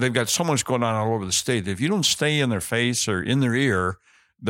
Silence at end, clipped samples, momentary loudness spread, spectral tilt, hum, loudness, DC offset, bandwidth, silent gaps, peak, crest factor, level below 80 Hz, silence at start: 0 s; under 0.1%; 4 LU; -4 dB/octave; none; -22 LUFS; under 0.1%; 17 kHz; none; -4 dBFS; 18 dB; -56 dBFS; 0 s